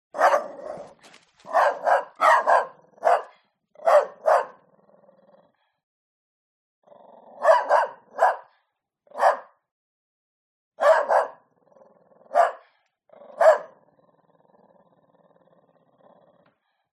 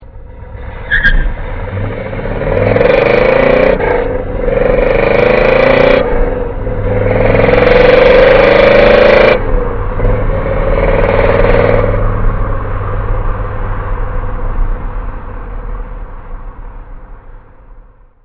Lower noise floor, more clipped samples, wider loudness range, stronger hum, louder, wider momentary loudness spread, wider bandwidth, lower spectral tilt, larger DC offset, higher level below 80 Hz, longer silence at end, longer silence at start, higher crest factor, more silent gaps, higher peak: first, -75 dBFS vs -38 dBFS; second, under 0.1% vs 1%; second, 5 LU vs 16 LU; neither; second, -22 LUFS vs -10 LUFS; second, 16 LU vs 20 LU; first, 13 kHz vs 5.4 kHz; second, -1.5 dB/octave vs -8 dB/octave; neither; second, -84 dBFS vs -16 dBFS; first, 3.3 s vs 0.45 s; first, 0.15 s vs 0 s; first, 20 dB vs 10 dB; first, 5.83-6.82 s, 9.71-10.71 s vs none; second, -4 dBFS vs 0 dBFS